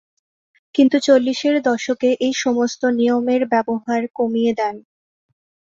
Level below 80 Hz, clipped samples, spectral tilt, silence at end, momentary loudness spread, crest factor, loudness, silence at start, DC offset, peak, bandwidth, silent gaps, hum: -64 dBFS; under 0.1%; -4 dB/octave; 0.95 s; 7 LU; 16 dB; -18 LUFS; 0.75 s; under 0.1%; -2 dBFS; 7.8 kHz; 4.10-4.14 s; none